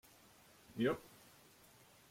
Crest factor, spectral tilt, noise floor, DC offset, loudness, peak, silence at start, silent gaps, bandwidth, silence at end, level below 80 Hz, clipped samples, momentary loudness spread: 22 dB; -6 dB/octave; -65 dBFS; under 0.1%; -41 LUFS; -24 dBFS; 0.7 s; none; 16.5 kHz; 1.05 s; -74 dBFS; under 0.1%; 25 LU